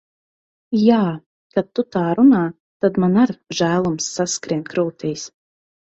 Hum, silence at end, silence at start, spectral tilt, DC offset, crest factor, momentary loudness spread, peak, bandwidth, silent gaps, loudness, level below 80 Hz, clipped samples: none; 0.65 s; 0.7 s; -5.5 dB/octave; under 0.1%; 18 dB; 12 LU; -2 dBFS; 8.2 kHz; 1.26-1.50 s, 2.60-2.80 s; -19 LUFS; -58 dBFS; under 0.1%